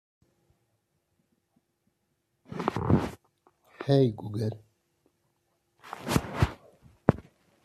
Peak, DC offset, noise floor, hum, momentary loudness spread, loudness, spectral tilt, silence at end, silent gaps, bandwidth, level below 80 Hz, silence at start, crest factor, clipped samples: -4 dBFS; under 0.1%; -77 dBFS; none; 18 LU; -29 LUFS; -7 dB/octave; 0.45 s; none; 14 kHz; -50 dBFS; 2.5 s; 30 dB; under 0.1%